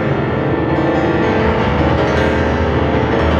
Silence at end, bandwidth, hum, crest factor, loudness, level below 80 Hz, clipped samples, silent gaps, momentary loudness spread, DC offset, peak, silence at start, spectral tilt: 0 s; 7.6 kHz; none; 12 dB; -15 LUFS; -26 dBFS; under 0.1%; none; 2 LU; under 0.1%; -2 dBFS; 0 s; -7.5 dB/octave